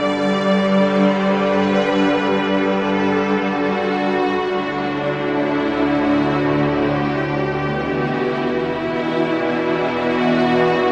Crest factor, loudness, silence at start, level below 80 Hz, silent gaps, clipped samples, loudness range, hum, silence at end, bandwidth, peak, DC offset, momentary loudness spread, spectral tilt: 14 dB; -18 LUFS; 0 s; -48 dBFS; none; under 0.1%; 3 LU; none; 0 s; 8.6 kHz; -4 dBFS; under 0.1%; 5 LU; -7 dB/octave